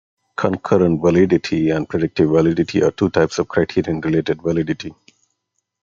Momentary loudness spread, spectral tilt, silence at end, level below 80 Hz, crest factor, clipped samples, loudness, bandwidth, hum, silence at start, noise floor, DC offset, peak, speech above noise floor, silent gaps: 7 LU; -7 dB/octave; 0.9 s; -50 dBFS; 16 dB; under 0.1%; -18 LUFS; 7.6 kHz; none; 0.4 s; -74 dBFS; under 0.1%; -2 dBFS; 57 dB; none